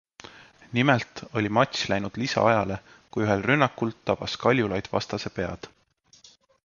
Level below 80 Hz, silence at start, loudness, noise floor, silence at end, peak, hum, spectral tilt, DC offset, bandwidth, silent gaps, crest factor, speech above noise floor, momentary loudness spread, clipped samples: -54 dBFS; 0.35 s; -25 LUFS; -58 dBFS; 1 s; -4 dBFS; none; -5.5 dB/octave; under 0.1%; 7.4 kHz; none; 22 dB; 33 dB; 11 LU; under 0.1%